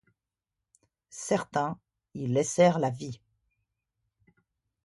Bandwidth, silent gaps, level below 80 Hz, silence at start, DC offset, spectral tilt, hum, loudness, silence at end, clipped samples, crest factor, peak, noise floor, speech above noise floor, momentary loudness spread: 11.5 kHz; none; -70 dBFS; 1.15 s; under 0.1%; -5.5 dB/octave; none; -28 LUFS; 1.7 s; under 0.1%; 22 dB; -10 dBFS; -88 dBFS; 61 dB; 22 LU